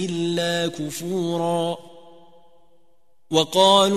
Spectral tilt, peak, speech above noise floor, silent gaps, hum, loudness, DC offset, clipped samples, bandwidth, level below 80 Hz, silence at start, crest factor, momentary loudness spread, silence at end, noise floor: -4 dB/octave; -4 dBFS; 46 dB; none; none; -21 LUFS; 0.4%; under 0.1%; 14 kHz; -64 dBFS; 0 s; 20 dB; 12 LU; 0 s; -66 dBFS